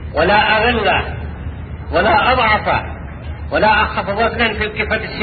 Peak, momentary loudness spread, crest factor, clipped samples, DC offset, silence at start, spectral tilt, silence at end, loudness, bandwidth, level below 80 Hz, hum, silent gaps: 0 dBFS; 16 LU; 16 dB; under 0.1%; under 0.1%; 0 s; -10.5 dB/octave; 0 s; -15 LUFS; 4.8 kHz; -30 dBFS; none; none